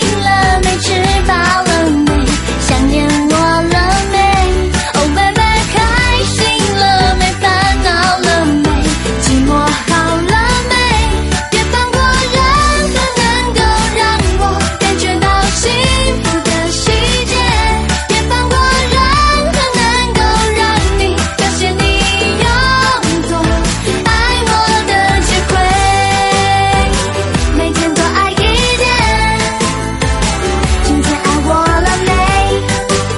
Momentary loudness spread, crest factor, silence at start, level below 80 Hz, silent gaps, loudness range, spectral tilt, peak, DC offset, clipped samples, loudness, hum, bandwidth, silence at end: 3 LU; 12 dB; 0 s; -18 dBFS; none; 1 LU; -4 dB/octave; 0 dBFS; under 0.1%; under 0.1%; -11 LUFS; none; 12 kHz; 0 s